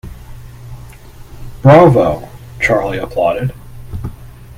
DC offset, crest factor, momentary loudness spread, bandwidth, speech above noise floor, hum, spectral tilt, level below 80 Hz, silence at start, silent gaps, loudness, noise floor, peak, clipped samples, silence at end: under 0.1%; 14 dB; 27 LU; 16 kHz; 24 dB; none; -8 dB/octave; -34 dBFS; 0.05 s; none; -12 LUFS; -34 dBFS; 0 dBFS; 0.2%; 0.05 s